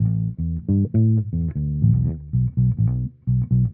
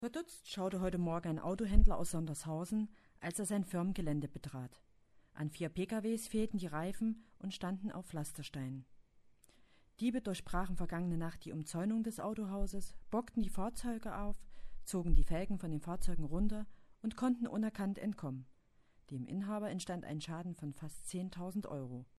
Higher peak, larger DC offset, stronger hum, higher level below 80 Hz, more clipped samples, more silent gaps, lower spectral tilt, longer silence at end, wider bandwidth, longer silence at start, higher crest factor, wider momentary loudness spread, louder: first, -6 dBFS vs -12 dBFS; neither; neither; first, -34 dBFS vs -42 dBFS; neither; neither; first, -17 dB/octave vs -6 dB/octave; second, 0 s vs 0.15 s; second, 1.3 kHz vs 13 kHz; about the same, 0 s vs 0 s; second, 14 dB vs 24 dB; second, 6 LU vs 9 LU; first, -21 LUFS vs -40 LUFS